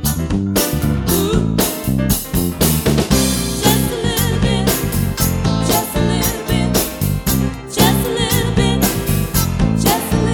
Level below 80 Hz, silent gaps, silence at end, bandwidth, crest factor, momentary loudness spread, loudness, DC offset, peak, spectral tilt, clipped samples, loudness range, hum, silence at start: -26 dBFS; none; 0 s; over 20 kHz; 16 dB; 4 LU; -16 LUFS; under 0.1%; 0 dBFS; -4.5 dB/octave; under 0.1%; 1 LU; none; 0 s